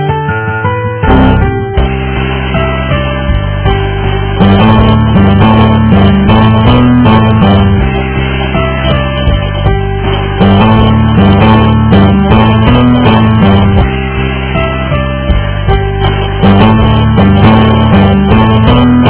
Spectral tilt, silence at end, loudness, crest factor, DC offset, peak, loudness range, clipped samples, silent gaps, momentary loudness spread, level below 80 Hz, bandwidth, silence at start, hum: -11.5 dB/octave; 0 s; -7 LUFS; 6 dB; under 0.1%; 0 dBFS; 5 LU; 4%; none; 7 LU; -16 dBFS; 4 kHz; 0 s; none